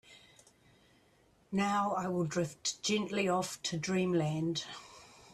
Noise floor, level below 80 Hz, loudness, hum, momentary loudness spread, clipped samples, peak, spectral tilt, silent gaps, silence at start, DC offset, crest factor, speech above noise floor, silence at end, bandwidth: -67 dBFS; -70 dBFS; -34 LUFS; none; 10 LU; under 0.1%; -20 dBFS; -4.5 dB/octave; none; 0.1 s; under 0.1%; 16 dB; 34 dB; 0.2 s; 13.5 kHz